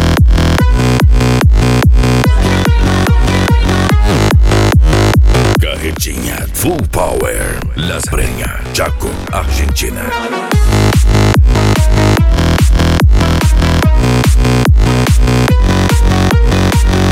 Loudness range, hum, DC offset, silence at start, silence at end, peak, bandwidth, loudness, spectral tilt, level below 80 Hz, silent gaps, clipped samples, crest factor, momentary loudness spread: 5 LU; none; under 0.1%; 0 s; 0 s; 0 dBFS; 16.5 kHz; -11 LUFS; -5.5 dB/octave; -12 dBFS; none; under 0.1%; 8 dB; 7 LU